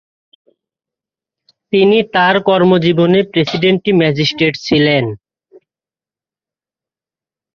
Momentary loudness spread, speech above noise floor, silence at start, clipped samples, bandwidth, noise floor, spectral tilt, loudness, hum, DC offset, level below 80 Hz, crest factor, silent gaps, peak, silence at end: 5 LU; over 78 dB; 1.7 s; under 0.1%; 7 kHz; under -90 dBFS; -6.5 dB/octave; -12 LUFS; none; under 0.1%; -52 dBFS; 14 dB; none; 0 dBFS; 2.4 s